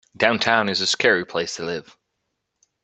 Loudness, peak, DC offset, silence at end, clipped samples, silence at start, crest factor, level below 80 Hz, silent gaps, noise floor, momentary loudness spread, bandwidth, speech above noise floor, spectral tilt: -20 LUFS; 0 dBFS; under 0.1%; 1 s; under 0.1%; 0.2 s; 22 dB; -64 dBFS; none; -77 dBFS; 11 LU; 9 kHz; 56 dB; -2.5 dB/octave